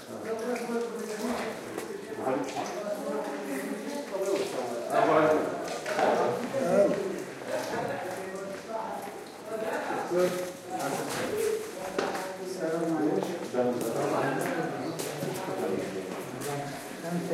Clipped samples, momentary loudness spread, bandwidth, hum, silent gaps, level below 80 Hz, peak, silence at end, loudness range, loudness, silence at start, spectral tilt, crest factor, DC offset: under 0.1%; 10 LU; 16 kHz; none; none; -72 dBFS; -10 dBFS; 0 s; 6 LU; -31 LUFS; 0 s; -5 dB/octave; 20 dB; under 0.1%